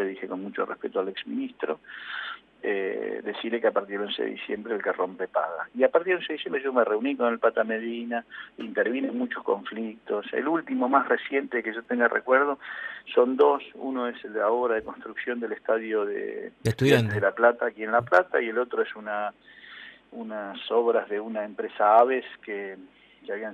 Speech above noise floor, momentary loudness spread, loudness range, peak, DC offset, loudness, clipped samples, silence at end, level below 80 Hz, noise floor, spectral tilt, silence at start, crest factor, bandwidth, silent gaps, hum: 20 dB; 14 LU; 5 LU; -6 dBFS; under 0.1%; -27 LUFS; under 0.1%; 0 s; -68 dBFS; -47 dBFS; -6.5 dB/octave; 0 s; 20 dB; 13 kHz; none; none